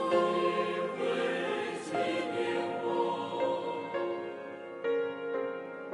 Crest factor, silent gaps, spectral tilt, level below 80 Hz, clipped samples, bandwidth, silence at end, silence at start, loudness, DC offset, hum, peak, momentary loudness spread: 18 dB; none; -5 dB/octave; -78 dBFS; under 0.1%; 11.5 kHz; 0 s; 0 s; -33 LUFS; under 0.1%; none; -14 dBFS; 8 LU